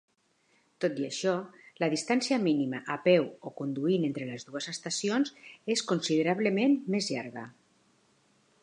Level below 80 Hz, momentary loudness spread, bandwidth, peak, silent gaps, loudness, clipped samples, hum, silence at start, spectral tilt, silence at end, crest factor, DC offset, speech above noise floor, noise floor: -82 dBFS; 12 LU; 11 kHz; -10 dBFS; none; -30 LUFS; under 0.1%; none; 0.8 s; -4.5 dB/octave; 1.1 s; 20 dB; under 0.1%; 41 dB; -70 dBFS